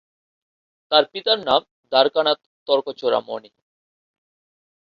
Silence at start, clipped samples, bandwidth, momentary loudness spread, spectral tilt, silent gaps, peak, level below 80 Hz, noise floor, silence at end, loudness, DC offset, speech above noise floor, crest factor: 0.9 s; under 0.1%; 6.6 kHz; 7 LU; -5 dB/octave; 1.71-1.83 s, 2.46-2.66 s; -2 dBFS; -68 dBFS; under -90 dBFS; 1.55 s; -20 LUFS; under 0.1%; over 70 dB; 20 dB